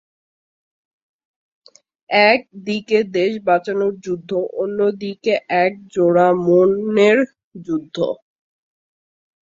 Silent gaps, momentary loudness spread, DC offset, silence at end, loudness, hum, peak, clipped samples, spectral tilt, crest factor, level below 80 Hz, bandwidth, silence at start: 7.44-7.51 s; 11 LU; under 0.1%; 1.3 s; -18 LUFS; none; -2 dBFS; under 0.1%; -6 dB/octave; 18 dB; -64 dBFS; 7.6 kHz; 2.1 s